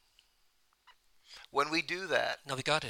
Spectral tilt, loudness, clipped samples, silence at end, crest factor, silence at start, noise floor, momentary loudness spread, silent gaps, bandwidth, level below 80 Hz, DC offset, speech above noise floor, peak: -3 dB/octave; -33 LUFS; under 0.1%; 0 s; 24 dB; 0.9 s; -71 dBFS; 15 LU; none; 17 kHz; -70 dBFS; under 0.1%; 38 dB; -12 dBFS